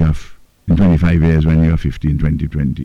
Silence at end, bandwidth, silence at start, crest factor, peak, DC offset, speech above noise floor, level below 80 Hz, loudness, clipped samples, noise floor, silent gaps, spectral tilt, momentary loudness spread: 0 s; 6.8 kHz; 0 s; 8 dB; -6 dBFS; under 0.1%; 20 dB; -22 dBFS; -14 LUFS; under 0.1%; -33 dBFS; none; -9.5 dB/octave; 7 LU